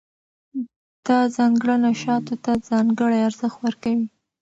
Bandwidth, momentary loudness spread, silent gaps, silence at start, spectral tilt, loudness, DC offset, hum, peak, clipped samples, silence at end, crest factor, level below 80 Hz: 8 kHz; 14 LU; 0.76-1.03 s; 0.55 s; -6 dB/octave; -21 LUFS; under 0.1%; none; -8 dBFS; under 0.1%; 0.35 s; 14 dB; -62 dBFS